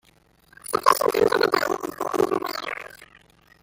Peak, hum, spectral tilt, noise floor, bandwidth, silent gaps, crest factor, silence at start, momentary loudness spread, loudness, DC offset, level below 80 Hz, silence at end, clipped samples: -2 dBFS; none; -3 dB/octave; -59 dBFS; 17 kHz; none; 22 dB; 0.65 s; 14 LU; -23 LUFS; under 0.1%; -60 dBFS; 0.6 s; under 0.1%